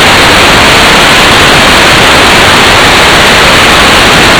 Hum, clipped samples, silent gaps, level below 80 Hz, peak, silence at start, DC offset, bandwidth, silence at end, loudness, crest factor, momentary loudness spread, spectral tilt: none; 40%; none; -20 dBFS; 0 dBFS; 0 s; 0.8%; over 20 kHz; 0 s; -1 LUFS; 2 dB; 0 LU; -2.5 dB/octave